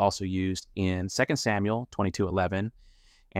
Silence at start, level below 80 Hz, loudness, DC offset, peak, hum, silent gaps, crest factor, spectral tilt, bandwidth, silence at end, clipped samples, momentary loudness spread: 0 s; -54 dBFS; -29 LUFS; under 0.1%; -10 dBFS; none; none; 18 dB; -5.5 dB/octave; 15 kHz; 0 s; under 0.1%; 5 LU